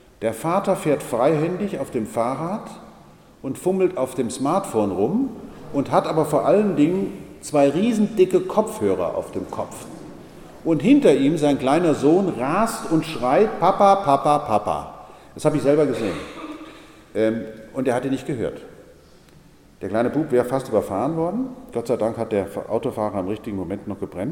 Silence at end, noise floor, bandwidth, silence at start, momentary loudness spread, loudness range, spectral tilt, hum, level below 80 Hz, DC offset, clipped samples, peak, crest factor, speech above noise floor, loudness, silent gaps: 0 s; -49 dBFS; 17.5 kHz; 0.2 s; 14 LU; 7 LU; -6.5 dB/octave; none; -52 dBFS; under 0.1%; under 0.1%; -2 dBFS; 20 dB; 29 dB; -21 LUFS; none